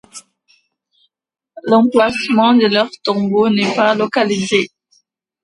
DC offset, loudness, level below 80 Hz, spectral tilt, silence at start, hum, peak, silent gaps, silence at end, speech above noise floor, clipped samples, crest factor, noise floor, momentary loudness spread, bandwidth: under 0.1%; -14 LUFS; -60 dBFS; -5 dB/octave; 0.15 s; none; 0 dBFS; none; 0.75 s; 48 dB; under 0.1%; 16 dB; -61 dBFS; 7 LU; 11.5 kHz